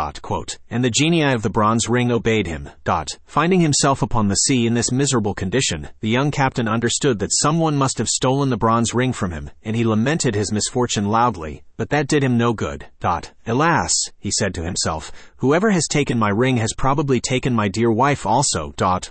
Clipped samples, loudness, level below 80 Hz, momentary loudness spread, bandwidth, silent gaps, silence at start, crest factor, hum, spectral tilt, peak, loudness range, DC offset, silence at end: under 0.1%; -19 LUFS; -40 dBFS; 9 LU; 8.8 kHz; none; 0 s; 14 dB; none; -4.5 dB/octave; -4 dBFS; 2 LU; under 0.1%; 0 s